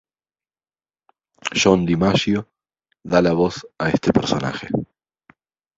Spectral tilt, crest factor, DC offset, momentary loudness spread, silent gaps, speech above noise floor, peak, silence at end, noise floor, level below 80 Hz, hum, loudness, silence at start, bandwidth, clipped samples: -5.5 dB/octave; 20 dB; under 0.1%; 10 LU; none; over 71 dB; -2 dBFS; 0.95 s; under -90 dBFS; -48 dBFS; none; -20 LUFS; 1.45 s; 7.8 kHz; under 0.1%